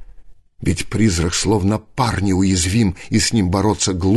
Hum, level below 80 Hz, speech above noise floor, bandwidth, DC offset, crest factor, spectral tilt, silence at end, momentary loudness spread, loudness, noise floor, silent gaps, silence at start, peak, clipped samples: none; -30 dBFS; 23 dB; 12.5 kHz; under 0.1%; 14 dB; -5 dB/octave; 0 s; 5 LU; -18 LUFS; -39 dBFS; none; 0 s; -4 dBFS; under 0.1%